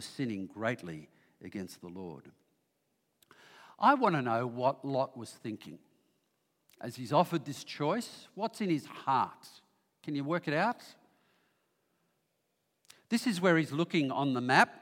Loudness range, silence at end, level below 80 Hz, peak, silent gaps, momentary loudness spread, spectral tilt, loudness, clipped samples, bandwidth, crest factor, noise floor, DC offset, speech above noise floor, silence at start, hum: 6 LU; 0 s; -84 dBFS; -8 dBFS; none; 18 LU; -5.5 dB/octave; -32 LUFS; under 0.1%; 16.5 kHz; 26 dB; -80 dBFS; under 0.1%; 48 dB; 0 s; none